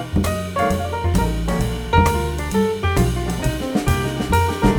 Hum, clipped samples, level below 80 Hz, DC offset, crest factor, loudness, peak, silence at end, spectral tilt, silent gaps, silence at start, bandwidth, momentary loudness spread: none; under 0.1%; -26 dBFS; under 0.1%; 18 dB; -20 LUFS; -2 dBFS; 0 s; -6 dB/octave; none; 0 s; 19.5 kHz; 5 LU